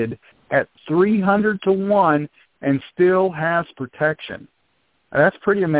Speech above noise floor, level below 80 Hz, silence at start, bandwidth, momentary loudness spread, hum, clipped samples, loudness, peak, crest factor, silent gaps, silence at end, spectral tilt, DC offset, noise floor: 48 dB; -58 dBFS; 0 s; 4 kHz; 14 LU; none; under 0.1%; -19 LUFS; -2 dBFS; 16 dB; none; 0 s; -11 dB/octave; under 0.1%; -66 dBFS